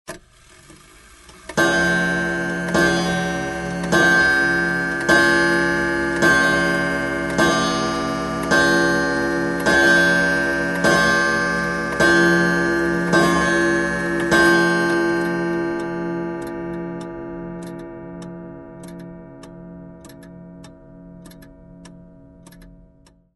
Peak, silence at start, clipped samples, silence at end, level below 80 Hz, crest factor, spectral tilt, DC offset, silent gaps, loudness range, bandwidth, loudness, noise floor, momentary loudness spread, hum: -2 dBFS; 0.1 s; under 0.1%; 0.65 s; -44 dBFS; 18 dB; -4.5 dB/octave; under 0.1%; none; 16 LU; 12 kHz; -18 LUFS; -53 dBFS; 20 LU; none